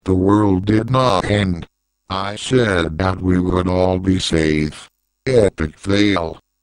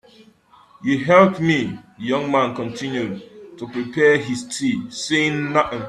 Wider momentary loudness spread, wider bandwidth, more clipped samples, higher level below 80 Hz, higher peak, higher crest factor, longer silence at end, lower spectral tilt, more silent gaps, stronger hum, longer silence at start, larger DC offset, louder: second, 9 LU vs 15 LU; second, 10.5 kHz vs 12.5 kHz; neither; first, -38 dBFS vs -58 dBFS; about the same, 0 dBFS vs 0 dBFS; about the same, 16 dB vs 20 dB; first, 0.25 s vs 0 s; about the same, -6 dB/octave vs -5 dB/octave; neither; neither; second, 0.05 s vs 0.8 s; neither; first, -17 LUFS vs -20 LUFS